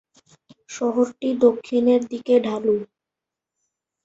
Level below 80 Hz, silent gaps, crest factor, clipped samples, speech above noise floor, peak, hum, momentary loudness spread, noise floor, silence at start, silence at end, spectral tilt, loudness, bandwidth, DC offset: -68 dBFS; none; 18 dB; under 0.1%; 67 dB; -4 dBFS; none; 8 LU; -86 dBFS; 0.7 s; 1.2 s; -5.5 dB/octave; -21 LUFS; 8 kHz; under 0.1%